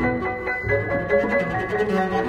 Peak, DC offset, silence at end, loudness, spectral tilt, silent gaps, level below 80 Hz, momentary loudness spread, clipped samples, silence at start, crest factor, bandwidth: -8 dBFS; under 0.1%; 0 s; -22 LUFS; -7.5 dB/octave; none; -42 dBFS; 5 LU; under 0.1%; 0 s; 14 dB; 13 kHz